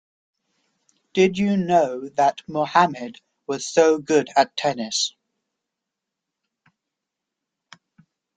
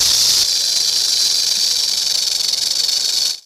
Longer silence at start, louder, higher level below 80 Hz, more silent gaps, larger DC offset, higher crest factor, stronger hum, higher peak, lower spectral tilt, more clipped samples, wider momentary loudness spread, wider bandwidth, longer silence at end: first, 1.15 s vs 0 s; second, -21 LUFS vs -13 LUFS; second, -66 dBFS vs -54 dBFS; neither; neither; first, 22 dB vs 12 dB; neither; about the same, -2 dBFS vs -4 dBFS; first, -4 dB/octave vs 3 dB/octave; neither; first, 11 LU vs 4 LU; second, 9.4 kHz vs 18 kHz; first, 3.3 s vs 0.05 s